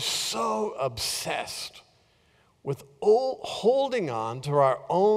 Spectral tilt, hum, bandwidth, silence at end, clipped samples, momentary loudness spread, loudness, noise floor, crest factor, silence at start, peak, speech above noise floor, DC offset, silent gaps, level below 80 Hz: -4 dB/octave; none; 16 kHz; 0 s; under 0.1%; 12 LU; -27 LUFS; -64 dBFS; 18 dB; 0 s; -10 dBFS; 38 dB; under 0.1%; none; -62 dBFS